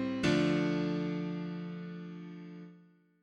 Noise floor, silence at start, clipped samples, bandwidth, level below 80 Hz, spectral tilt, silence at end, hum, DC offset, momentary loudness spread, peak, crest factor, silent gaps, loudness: -61 dBFS; 0 s; under 0.1%; 10 kHz; -64 dBFS; -6.5 dB/octave; 0.4 s; none; under 0.1%; 19 LU; -16 dBFS; 18 dB; none; -34 LUFS